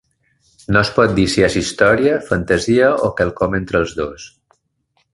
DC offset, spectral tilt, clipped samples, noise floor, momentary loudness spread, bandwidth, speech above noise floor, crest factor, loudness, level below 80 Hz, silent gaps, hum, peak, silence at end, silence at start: under 0.1%; -5 dB/octave; under 0.1%; -65 dBFS; 7 LU; 11.5 kHz; 50 dB; 16 dB; -16 LUFS; -38 dBFS; none; none; 0 dBFS; 0.85 s; 0.7 s